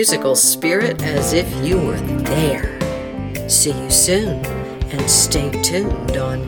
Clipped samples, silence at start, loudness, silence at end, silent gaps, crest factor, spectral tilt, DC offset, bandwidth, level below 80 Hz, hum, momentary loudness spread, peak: under 0.1%; 0 s; -16 LUFS; 0 s; none; 18 dB; -3.5 dB/octave; under 0.1%; 19 kHz; -30 dBFS; none; 11 LU; 0 dBFS